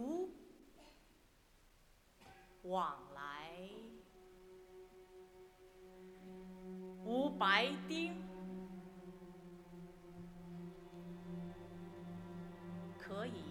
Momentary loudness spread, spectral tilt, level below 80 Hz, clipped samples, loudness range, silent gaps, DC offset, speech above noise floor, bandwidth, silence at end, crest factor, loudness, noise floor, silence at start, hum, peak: 22 LU; -5 dB/octave; -70 dBFS; under 0.1%; 15 LU; none; under 0.1%; 30 dB; 18.5 kHz; 0 s; 30 dB; -43 LUFS; -69 dBFS; 0 s; none; -16 dBFS